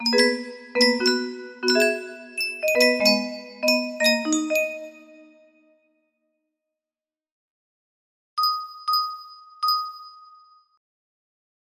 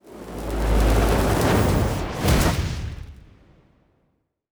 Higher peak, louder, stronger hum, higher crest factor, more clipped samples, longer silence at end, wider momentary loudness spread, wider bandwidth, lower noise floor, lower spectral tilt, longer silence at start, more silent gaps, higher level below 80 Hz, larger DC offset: about the same, -4 dBFS vs -6 dBFS; about the same, -22 LUFS vs -22 LUFS; neither; about the same, 22 dB vs 18 dB; neither; first, 1.65 s vs 1.4 s; about the same, 15 LU vs 16 LU; second, 15.5 kHz vs over 20 kHz; first, under -90 dBFS vs -70 dBFS; second, -2 dB/octave vs -5.5 dB/octave; about the same, 0 s vs 0.05 s; first, 7.32-8.37 s vs none; second, -74 dBFS vs -26 dBFS; neither